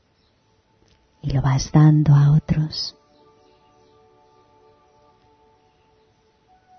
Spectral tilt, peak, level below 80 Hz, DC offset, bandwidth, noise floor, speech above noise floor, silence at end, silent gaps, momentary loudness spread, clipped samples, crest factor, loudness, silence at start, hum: -7 dB/octave; -4 dBFS; -44 dBFS; under 0.1%; 6.4 kHz; -62 dBFS; 46 dB; 3.9 s; none; 14 LU; under 0.1%; 18 dB; -18 LUFS; 1.25 s; none